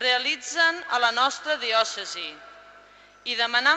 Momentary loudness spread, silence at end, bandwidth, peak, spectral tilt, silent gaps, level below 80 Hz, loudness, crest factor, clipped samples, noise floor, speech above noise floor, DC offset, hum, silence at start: 13 LU; 0 s; 8.8 kHz; -6 dBFS; 1 dB/octave; none; -70 dBFS; -23 LUFS; 18 dB; under 0.1%; -52 dBFS; 27 dB; under 0.1%; 50 Hz at -70 dBFS; 0 s